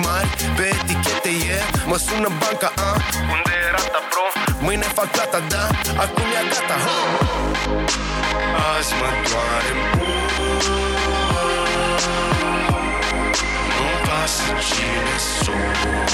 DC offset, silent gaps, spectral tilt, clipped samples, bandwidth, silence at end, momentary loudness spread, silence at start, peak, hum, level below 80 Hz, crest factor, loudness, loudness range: under 0.1%; none; -3.5 dB/octave; under 0.1%; over 20 kHz; 0 s; 2 LU; 0 s; -2 dBFS; none; -30 dBFS; 16 dB; -19 LUFS; 0 LU